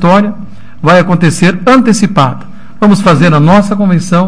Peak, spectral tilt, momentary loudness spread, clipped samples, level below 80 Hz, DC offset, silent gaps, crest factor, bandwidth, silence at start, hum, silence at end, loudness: 0 dBFS; -6.5 dB/octave; 7 LU; 4%; -38 dBFS; 8%; none; 8 dB; 10.5 kHz; 0 s; none; 0 s; -8 LUFS